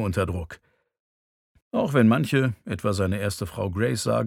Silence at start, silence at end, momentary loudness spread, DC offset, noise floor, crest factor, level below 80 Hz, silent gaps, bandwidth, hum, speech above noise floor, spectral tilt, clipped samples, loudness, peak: 0 s; 0 s; 10 LU; under 0.1%; under -90 dBFS; 18 dB; -50 dBFS; 1.00-1.55 s, 1.62-1.71 s; 16 kHz; none; over 66 dB; -6.5 dB/octave; under 0.1%; -25 LUFS; -6 dBFS